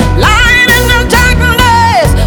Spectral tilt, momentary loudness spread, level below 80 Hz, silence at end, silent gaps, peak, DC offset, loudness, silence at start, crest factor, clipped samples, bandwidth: -4 dB/octave; 3 LU; -14 dBFS; 0 s; none; 0 dBFS; under 0.1%; -6 LUFS; 0 s; 6 dB; 0.1%; over 20 kHz